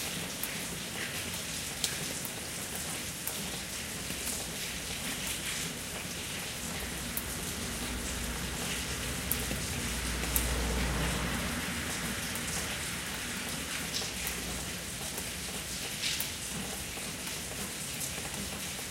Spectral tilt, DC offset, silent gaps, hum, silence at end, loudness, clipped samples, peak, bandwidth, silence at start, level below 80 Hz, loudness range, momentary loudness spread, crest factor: -2.5 dB/octave; under 0.1%; none; none; 0 s; -34 LUFS; under 0.1%; -6 dBFS; 16.5 kHz; 0 s; -46 dBFS; 3 LU; 4 LU; 30 dB